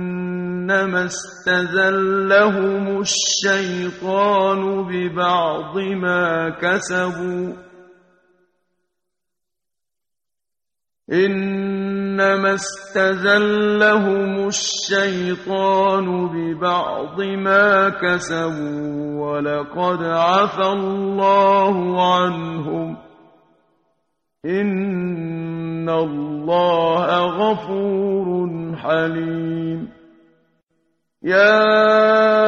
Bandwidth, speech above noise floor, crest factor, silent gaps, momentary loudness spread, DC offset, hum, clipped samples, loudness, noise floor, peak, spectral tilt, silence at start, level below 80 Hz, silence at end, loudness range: 9.4 kHz; 69 dB; 18 dB; none; 11 LU; under 0.1%; none; under 0.1%; -18 LUFS; -87 dBFS; -2 dBFS; -4.5 dB/octave; 0 s; -60 dBFS; 0 s; 8 LU